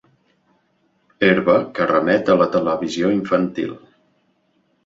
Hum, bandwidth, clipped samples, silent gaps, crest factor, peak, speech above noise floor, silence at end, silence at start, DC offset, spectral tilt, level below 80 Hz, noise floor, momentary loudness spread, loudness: none; 7.8 kHz; under 0.1%; none; 18 dB; -2 dBFS; 47 dB; 1.1 s; 1.2 s; under 0.1%; -6.5 dB/octave; -58 dBFS; -64 dBFS; 7 LU; -18 LUFS